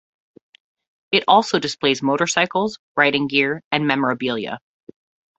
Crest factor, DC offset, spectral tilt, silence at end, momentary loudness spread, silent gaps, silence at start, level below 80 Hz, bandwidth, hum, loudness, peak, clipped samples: 20 dB; under 0.1%; -3.5 dB/octave; 0.8 s; 8 LU; 2.79-2.95 s, 3.64-3.71 s; 1.1 s; -62 dBFS; 8.2 kHz; none; -19 LUFS; 0 dBFS; under 0.1%